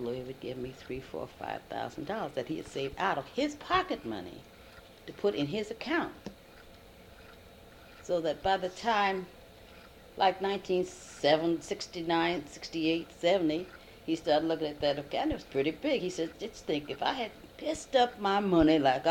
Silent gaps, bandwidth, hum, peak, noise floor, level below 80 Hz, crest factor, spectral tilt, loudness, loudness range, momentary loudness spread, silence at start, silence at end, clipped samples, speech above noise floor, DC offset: none; 17.5 kHz; none; -12 dBFS; -54 dBFS; -58 dBFS; 20 dB; -5 dB/octave; -32 LUFS; 6 LU; 13 LU; 0 s; 0 s; under 0.1%; 22 dB; under 0.1%